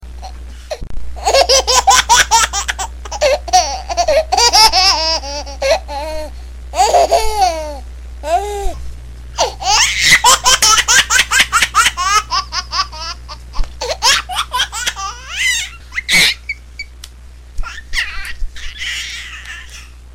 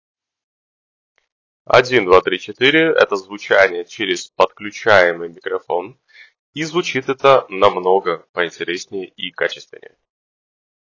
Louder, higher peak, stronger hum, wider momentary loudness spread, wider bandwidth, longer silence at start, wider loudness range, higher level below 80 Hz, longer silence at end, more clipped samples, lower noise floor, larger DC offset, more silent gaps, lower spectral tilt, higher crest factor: first, -12 LUFS vs -16 LUFS; about the same, 0 dBFS vs 0 dBFS; neither; first, 21 LU vs 13 LU; first, 17 kHz vs 7.6 kHz; second, 0 s vs 1.7 s; first, 7 LU vs 4 LU; first, -28 dBFS vs -54 dBFS; second, 0 s vs 1.3 s; neither; second, -35 dBFS vs under -90 dBFS; first, 0.6% vs under 0.1%; second, none vs 6.39-6.53 s, 8.29-8.34 s; second, 0 dB/octave vs -4 dB/octave; about the same, 16 dB vs 18 dB